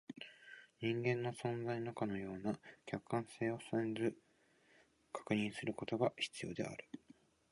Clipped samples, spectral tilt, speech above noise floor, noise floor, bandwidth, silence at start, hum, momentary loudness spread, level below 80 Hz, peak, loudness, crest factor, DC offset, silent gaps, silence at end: under 0.1%; -6 dB/octave; 31 dB; -72 dBFS; 11.5 kHz; 0.1 s; none; 14 LU; -76 dBFS; -22 dBFS; -41 LUFS; 20 dB; under 0.1%; none; 0.55 s